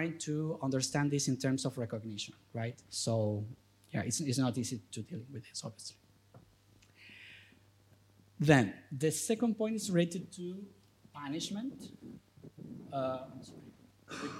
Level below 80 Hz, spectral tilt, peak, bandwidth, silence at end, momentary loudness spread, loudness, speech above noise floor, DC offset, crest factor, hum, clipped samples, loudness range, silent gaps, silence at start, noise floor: -72 dBFS; -5 dB/octave; -10 dBFS; 16 kHz; 0 s; 21 LU; -35 LUFS; 30 dB; under 0.1%; 26 dB; none; under 0.1%; 10 LU; none; 0 s; -65 dBFS